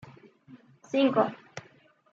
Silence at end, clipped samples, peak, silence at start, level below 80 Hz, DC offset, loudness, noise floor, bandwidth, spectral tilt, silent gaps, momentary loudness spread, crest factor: 0.5 s; under 0.1%; -8 dBFS; 0.05 s; -78 dBFS; under 0.1%; -27 LUFS; -60 dBFS; 7.6 kHz; -6 dB/octave; none; 22 LU; 22 dB